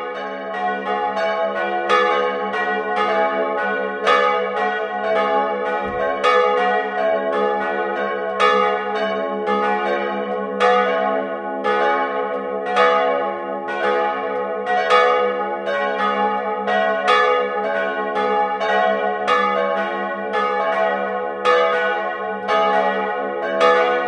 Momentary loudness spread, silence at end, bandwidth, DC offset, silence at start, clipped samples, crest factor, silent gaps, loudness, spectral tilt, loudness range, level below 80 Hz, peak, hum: 7 LU; 0 s; 9.8 kHz; under 0.1%; 0 s; under 0.1%; 18 dB; none; -19 LUFS; -4.5 dB/octave; 1 LU; -62 dBFS; 0 dBFS; none